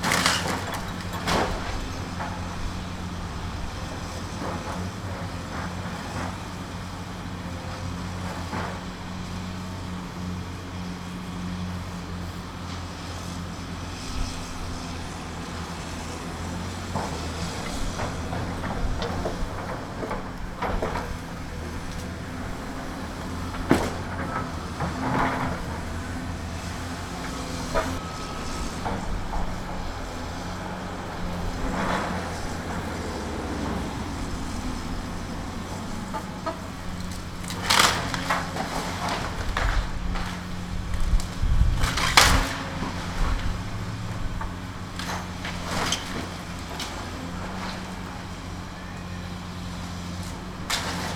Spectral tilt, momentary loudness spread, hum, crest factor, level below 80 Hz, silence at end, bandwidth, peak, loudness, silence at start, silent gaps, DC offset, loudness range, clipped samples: -4 dB/octave; 9 LU; none; 28 dB; -34 dBFS; 0 s; 19 kHz; 0 dBFS; -30 LUFS; 0 s; none; under 0.1%; 10 LU; under 0.1%